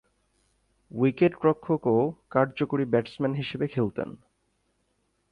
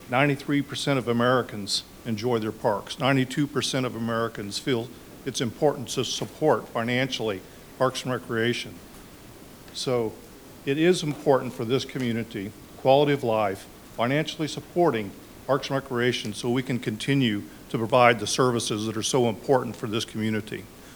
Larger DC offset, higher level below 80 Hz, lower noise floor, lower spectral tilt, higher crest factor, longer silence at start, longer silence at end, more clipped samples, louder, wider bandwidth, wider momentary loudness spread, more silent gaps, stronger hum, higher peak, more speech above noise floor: neither; second, -64 dBFS vs -56 dBFS; first, -73 dBFS vs -46 dBFS; first, -9 dB/octave vs -5 dB/octave; about the same, 18 dB vs 22 dB; first, 0.95 s vs 0 s; first, 1.15 s vs 0 s; neither; about the same, -26 LUFS vs -26 LUFS; second, 8.6 kHz vs over 20 kHz; second, 7 LU vs 14 LU; neither; first, 50 Hz at -60 dBFS vs none; second, -10 dBFS vs -4 dBFS; first, 47 dB vs 21 dB